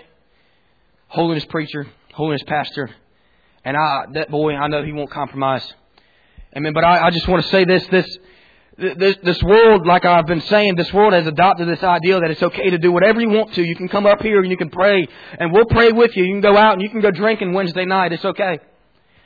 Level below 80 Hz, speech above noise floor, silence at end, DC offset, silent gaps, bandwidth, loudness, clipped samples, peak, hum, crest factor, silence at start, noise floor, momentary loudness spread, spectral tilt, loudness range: -42 dBFS; 45 dB; 0.7 s; under 0.1%; none; 5 kHz; -16 LUFS; under 0.1%; -2 dBFS; none; 14 dB; 1.1 s; -60 dBFS; 13 LU; -8 dB/octave; 8 LU